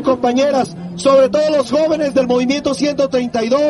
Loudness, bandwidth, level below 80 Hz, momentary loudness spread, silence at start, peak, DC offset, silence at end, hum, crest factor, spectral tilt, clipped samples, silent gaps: -15 LUFS; 11.5 kHz; -50 dBFS; 6 LU; 0 s; -2 dBFS; under 0.1%; 0 s; none; 12 dB; -5 dB/octave; under 0.1%; none